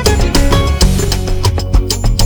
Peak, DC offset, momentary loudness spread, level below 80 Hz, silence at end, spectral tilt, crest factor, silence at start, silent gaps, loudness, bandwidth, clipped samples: 0 dBFS; under 0.1%; 4 LU; -14 dBFS; 0 s; -4.5 dB/octave; 10 dB; 0 s; none; -13 LUFS; over 20 kHz; under 0.1%